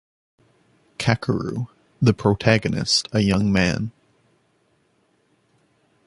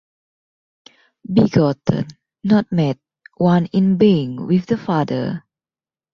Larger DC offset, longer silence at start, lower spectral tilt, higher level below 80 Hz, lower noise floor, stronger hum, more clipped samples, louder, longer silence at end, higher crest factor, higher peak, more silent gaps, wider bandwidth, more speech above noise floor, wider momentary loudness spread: neither; second, 1 s vs 1.3 s; second, -5.5 dB/octave vs -8.5 dB/octave; first, -46 dBFS vs -52 dBFS; second, -64 dBFS vs under -90 dBFS; neither; neither; second, -21 LUFS vs -18 LUFS; first, 2.15 s vs 0.75 s; first, 22 dB vs 16 dB; about the same, -2 dBFS vs -2 dBFS; neither; first, 11.5 kHz vs 6.8 kHz; second, 45 dB vs over 74 dB; about the same, 12 LU vs 12 LU